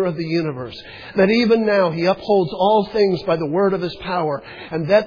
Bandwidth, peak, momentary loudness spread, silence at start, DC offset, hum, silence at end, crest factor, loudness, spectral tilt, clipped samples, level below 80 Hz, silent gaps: 5.2 kHz; -2 dBFS; 12 LU; 0 s; under 0.1%; none; 0 s; 16 dB; -19 LUFS; -7.5 dB/octave; under 0.1%; -52 dBFS; none